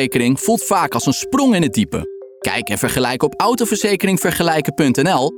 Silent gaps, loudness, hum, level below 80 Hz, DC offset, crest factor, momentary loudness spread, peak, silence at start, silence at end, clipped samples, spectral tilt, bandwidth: none; -17 LUFS; none; -46 dBFS; under 0.1%; 14 dB; 6 LU; -4 dBFS; 0 s; 0 s; under 0.1%; -4.5 dB/octave; 20 kHz